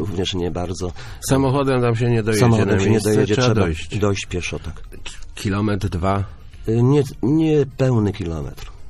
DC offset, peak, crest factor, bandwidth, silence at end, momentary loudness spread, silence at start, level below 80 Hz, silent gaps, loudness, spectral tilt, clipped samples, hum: under 0.1%; -2 dBFS; 16 dB; 14 kHz; 0 s; 14 LU; 0 s; -36 dBFS; none; -19 LUFS; -6.5 dB/octave; under 0.1%; none